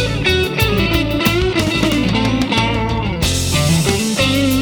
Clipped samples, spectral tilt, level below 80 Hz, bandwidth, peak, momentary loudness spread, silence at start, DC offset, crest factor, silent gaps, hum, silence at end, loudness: under 0.1%; -4.5 dB/octave; -26 dBFS; over 20 kHz; 0 dBFS; 3 LU; 0 s; under 0.1%; 16 dB; none; none; 0 s; -15 LUFS